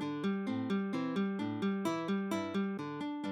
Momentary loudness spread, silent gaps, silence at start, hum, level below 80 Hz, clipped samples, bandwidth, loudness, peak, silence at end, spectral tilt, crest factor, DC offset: 3 LU; none; 0 s; none; -80 dBFS; under 0.1%; 13.5 kHz; -36 LUFS; -22 dBFS; 0 s; -6.5 dB/octave; 12 dB; under 0.1%